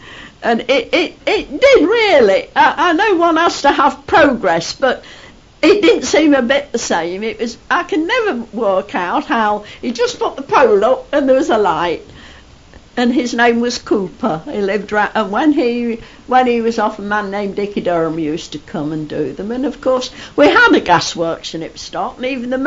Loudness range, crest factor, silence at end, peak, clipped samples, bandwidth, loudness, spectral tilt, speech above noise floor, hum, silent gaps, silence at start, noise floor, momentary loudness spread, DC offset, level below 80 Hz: 5 LU; 14 dB; 0 s; 0 dBFS; under 0.1%; 7.8 kHz; -14 LUFS; -4 dB/octave; 27 dB; none; none; 0 s; -41 dBFS; 11 LU; under 0.1%; -46 dBFS